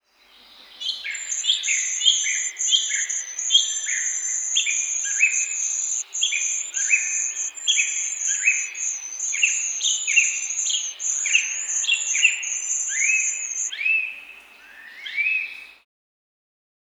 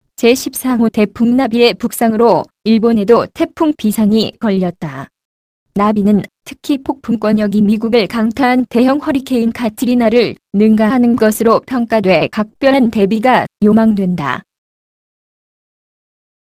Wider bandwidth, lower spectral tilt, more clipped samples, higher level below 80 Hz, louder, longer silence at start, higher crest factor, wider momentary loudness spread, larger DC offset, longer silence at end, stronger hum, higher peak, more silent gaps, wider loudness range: first, over 20 kHz vs 15.5 kHz; second, 7.5 dB/octave vs -6 dB/octave; neither; second, -78 dBFS vs -46 dBFS; second, -20 LUFS vs -13 LUFS; first, 0.55 s vs 0.2 s; first, 22 dB vs 14 dB; about the same, 8 LU vs 7 LU; neither; second, 1.1 s vs 2.2 s; neither; about the same, -2 dBFS vs 0 dBFS; second, none vs 5.25-5.66 s; about the same, 3 LU vs 4 LU